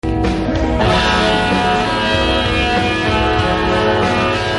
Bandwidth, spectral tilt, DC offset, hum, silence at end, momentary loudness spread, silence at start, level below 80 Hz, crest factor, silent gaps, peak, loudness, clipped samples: 11.5 kHz; -5.5 dB/octave; under 0.1%; none; 0 s; 4 LU; 0.05 s; -26 dBFS; 14 dB; none; 0 dBFS; -15 LUFS; under 0.1%